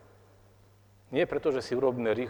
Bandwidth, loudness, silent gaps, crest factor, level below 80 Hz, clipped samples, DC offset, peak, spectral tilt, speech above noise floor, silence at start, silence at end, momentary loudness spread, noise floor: 19 kHz; -29 LUFS; none; 18 dB; -62 dBFS; under 0.1%; under 0.1%; -14 dBFS; -6.5 dB/octave; 31 dB; 1.1 s; 0 s; 3 LU; -59 dBFS